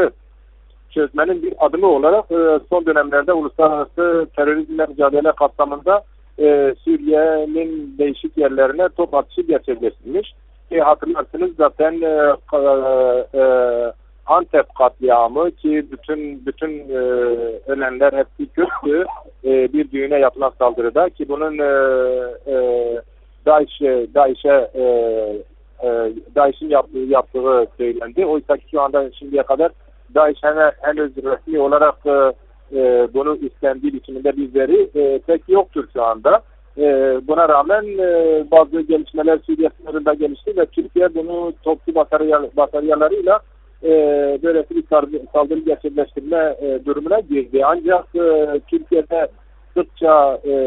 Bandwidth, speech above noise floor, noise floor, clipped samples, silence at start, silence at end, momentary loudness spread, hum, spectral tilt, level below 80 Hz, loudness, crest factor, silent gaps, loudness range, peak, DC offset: 4.1 kHz; 30 dB; -46 dBFS; under 0.1%; 0 s; 0 s; 8 LU; none; -4 dB/octave; -46 dBFS; -17 LUFS; 16 dB; none; 3 LU; 0 dBFS; under 0.1%